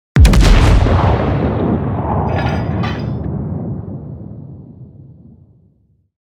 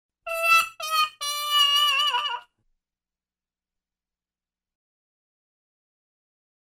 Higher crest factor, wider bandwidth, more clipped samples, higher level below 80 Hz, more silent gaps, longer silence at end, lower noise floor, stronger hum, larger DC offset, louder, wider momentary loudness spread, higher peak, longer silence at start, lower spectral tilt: second, 14 dB vs 20 dB; second, 12.5 kHz vs 18 kHz; neither; first, -18 dBFS vs -72 dBFS; neither; second, 1.15 s vs 4.3 s; second, -55 dBFS vs under -90 dBFS; second, none vs 60 Hz at -95 dBFS; neither; first, -15 LUFS vs -21 LUFS; first, 20 LU vs 12 LU; first, 0 dBFS vs -8 dBFS; about the same, 0.15 s vs 0.25 s; first, -7 dB/octave vs 3.5 dB/octave